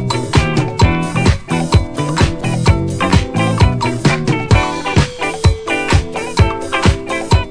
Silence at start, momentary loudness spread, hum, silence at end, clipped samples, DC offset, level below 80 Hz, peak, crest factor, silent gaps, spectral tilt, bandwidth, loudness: 0 s; 3 LU; none; 0 s; 0.2%; under 0.1%; -22 dBFS; 0 dBFS; 14 dB; none; -5.5 dB/octave; 10.5 kHz; -15 LUFS